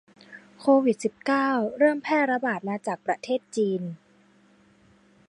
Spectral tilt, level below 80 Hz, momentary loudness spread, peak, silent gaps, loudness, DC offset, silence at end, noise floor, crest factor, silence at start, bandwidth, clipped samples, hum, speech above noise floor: -6 dB/octave; -76 dBFS; 9 LU; -8 dBFS; none; -25 LUFS; under 0.1%; 1.35 s; -59 dBFS; 18 dB; 0.3 s; 11 kHz; under 0.1%; none; 35 dB